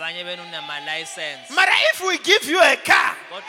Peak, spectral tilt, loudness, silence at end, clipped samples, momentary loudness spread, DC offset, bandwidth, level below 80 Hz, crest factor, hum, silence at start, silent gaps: -2 dBFS; -0.5 dB/octave; -17 LUFS; 0 s; under 0.1%; 15 LU; under 0.1%; 18.5 kHz; -68 dBFS; 18 dB; none; 0 s; none